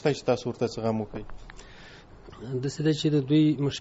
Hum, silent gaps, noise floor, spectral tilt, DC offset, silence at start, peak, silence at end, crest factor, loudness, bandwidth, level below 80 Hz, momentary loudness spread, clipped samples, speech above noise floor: none; none; -48 dBFS; -6.5 dB/octave; under 0.1%; 0 s; -10 dBFS; 0 s; 18 dB; -27 LUFS; 8 kHz; -52 dBFS; 25 LU; under 0.1%; 22 dB